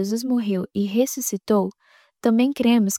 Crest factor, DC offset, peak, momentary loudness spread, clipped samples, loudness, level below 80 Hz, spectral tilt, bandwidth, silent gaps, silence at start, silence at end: 14 dB; under 0.1%; -6 dBFS; 6 LU; under 0.1%; -22 LUFS; -66 dBFS; -5 dB/octave; 17 kHz; none; 0 s; 0 s